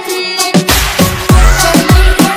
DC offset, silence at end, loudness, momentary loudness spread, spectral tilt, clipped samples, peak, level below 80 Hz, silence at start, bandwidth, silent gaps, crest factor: under 0.1%; 0 s; -9 LUFS; 4 LU; -4 dB/octave; 4%; 0 dBFS; -12 dBFS; 0 s; over 20 kHz; none; 8 dB